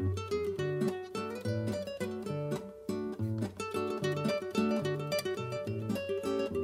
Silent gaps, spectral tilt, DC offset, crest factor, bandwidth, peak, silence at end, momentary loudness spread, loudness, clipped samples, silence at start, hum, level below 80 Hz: none; -6.5 dB/octave; under 0.1%; 16 dB; 16 kHz; -18 dBFS; 0 s; 6 LU; -35 LUFS; under 0.1%; 0 s; none; -64 dBFS